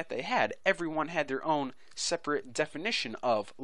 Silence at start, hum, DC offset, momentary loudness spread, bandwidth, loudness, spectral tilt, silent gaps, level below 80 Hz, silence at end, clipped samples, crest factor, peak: 0 s; none; 0.3%; 4 LU; 11 kHz; -31 LUFS; -3 dB/octave; none; -68 dBFS; 0 s; under 0.1%; 22 dB; -10 dBFS